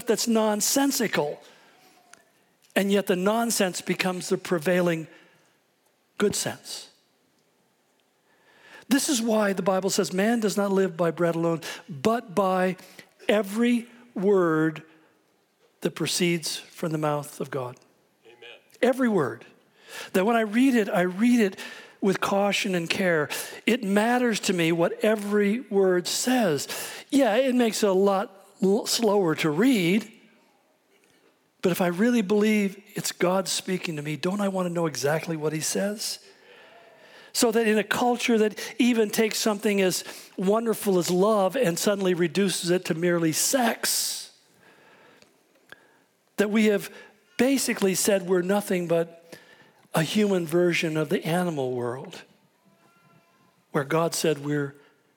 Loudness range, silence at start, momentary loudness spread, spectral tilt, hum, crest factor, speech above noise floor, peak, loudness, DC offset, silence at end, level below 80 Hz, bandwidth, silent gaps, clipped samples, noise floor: 6 LU; 0 s; 10 LU; -4.5 dB/octave; none; 20 dB; 43 dB; -6 dBFS; -24 LUFS; under 0.1%; 0.45 s; -74 dBFS; 19 kHz; none; under 0.1%; -67 dBFS